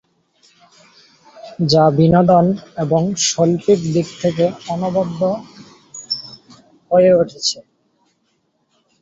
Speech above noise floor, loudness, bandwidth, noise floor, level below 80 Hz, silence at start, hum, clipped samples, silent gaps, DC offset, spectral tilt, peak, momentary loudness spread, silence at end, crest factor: 50 dB; -16 LUFS; 8 kHz; -65 dBFS; -50 dBFS; 1.35 s; none; under 0.1%; none; under 0.1%; -5.5 dB/octave; -2 dBFS; 13 LU; 1.4 s; 16 dB